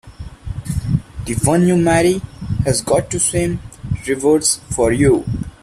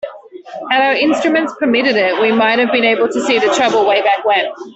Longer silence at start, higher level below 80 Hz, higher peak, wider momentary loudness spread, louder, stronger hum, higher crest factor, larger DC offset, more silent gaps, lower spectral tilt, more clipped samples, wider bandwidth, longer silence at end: about the same, 0.05 s vs 0.05 s; first, -34 dBFS vs -60 dBFS; about the same, -2 dBFS vs -2 dBFS; first, 12 LU vs 4 LU; second, -17 LUFS vs -13 LUFS; neither; about the same, 16 dB vs 12 dB; neither; neither; first, -5 dB/octave vs -3.5 dB/octave; neither; first, 15 kHz vs 8.2 kHz; first, 0.15 s vs 0 s